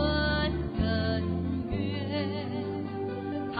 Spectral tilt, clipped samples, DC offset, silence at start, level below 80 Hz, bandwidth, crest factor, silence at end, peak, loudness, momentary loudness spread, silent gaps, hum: -9.5 dB/octave; under 0.1%; under 0.1%; 0 s; -40 dBFS; 5 kHz; 14 dB; 0 s; -16 dBFS; -31 LUFS; 7 LU; none; none